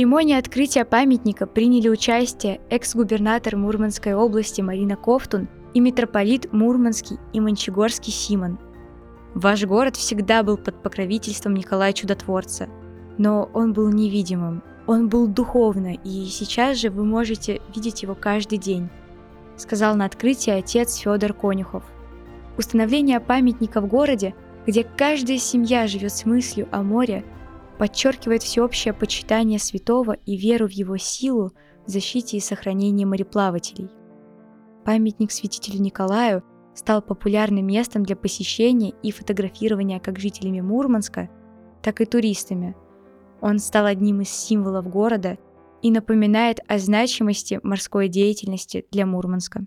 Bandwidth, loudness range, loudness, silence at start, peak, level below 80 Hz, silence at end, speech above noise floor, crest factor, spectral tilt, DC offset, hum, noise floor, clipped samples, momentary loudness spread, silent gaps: 15 kHz; 4 LU; -21 LUFS; 0 s; -4 dBFS; -46 dBFS; 0 s; 29 dB; 18 dB; -5 dB/octave; under 0.1%; none; -49 dBFS; under 0.1%; 10 LU; none